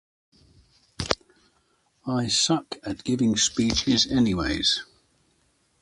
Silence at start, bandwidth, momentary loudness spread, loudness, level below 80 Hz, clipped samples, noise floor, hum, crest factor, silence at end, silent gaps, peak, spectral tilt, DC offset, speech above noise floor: 1 s; 11.5 kHz; 10 LU; -24 LUFS; -46 dBFS; under 0.1%; -67 dBFS; none; 26 dB; 0.95 s; none; -2 dBFS; -3.5 dB/octave; under 0.1%; 43 dB